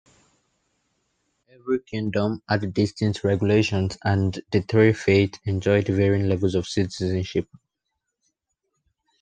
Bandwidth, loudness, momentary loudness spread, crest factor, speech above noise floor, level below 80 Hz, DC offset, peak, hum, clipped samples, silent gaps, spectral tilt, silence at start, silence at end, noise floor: 9.2 kHz; -23 LUFS; 8 LU; 20 dB; 58 dB; -56 dBFS; under 0.1%; -4 dBFS; none; under 0.1%; none; -7 dB/octave; 1.65 s; 1.75 s; -80 dBFS